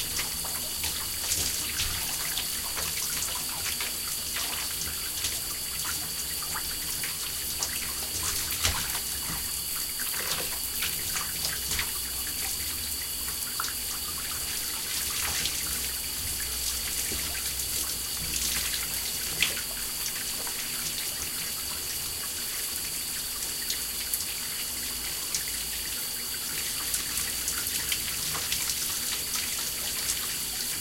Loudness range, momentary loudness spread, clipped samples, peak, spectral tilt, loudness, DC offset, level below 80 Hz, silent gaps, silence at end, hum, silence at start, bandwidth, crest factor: 2 LU; 3 LU; under 0.1%; -8 dBFS; 0 dB/octave; -28 LUFS; under 0.1%; -48 dBFS; none; 0 s; none; 0 s; 17 kHz; 24 dB